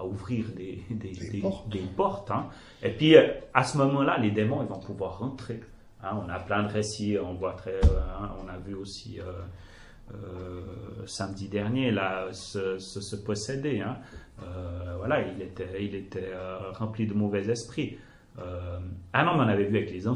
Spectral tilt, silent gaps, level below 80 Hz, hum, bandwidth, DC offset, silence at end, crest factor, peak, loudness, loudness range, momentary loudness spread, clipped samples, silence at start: -6 dB/octave; none; -40 dBFS; none; 11.5 kHz; under 0.1%; 0 s; 26 dB; -2 dBFS; -29 LUFS; 9 LU; 15 LU; under 0.1%; 0 s